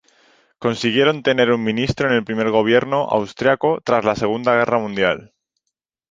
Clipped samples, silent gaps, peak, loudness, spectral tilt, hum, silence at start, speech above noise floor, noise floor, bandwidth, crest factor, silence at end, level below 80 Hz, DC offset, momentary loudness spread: under 0.1%; none; 0 dBFS; -18 LUFS; -5.5 dB/octave; none; 0.6 s; 61 dB; -79 dBFS; 7.6 kHz; 18 dB; 0.9 s; -50 dBFS; under 0.1%; 4 LU